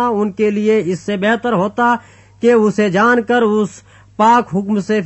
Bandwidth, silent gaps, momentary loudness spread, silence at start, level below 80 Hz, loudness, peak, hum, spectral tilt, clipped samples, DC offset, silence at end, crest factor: 8.4 kHz; none; 6 LU; 0 s; -56 dBFS; -15 LUFS; -2 dBFS; none; -6 dB/octave; under 0.1%; under 0.1%; 0 s; 12 dB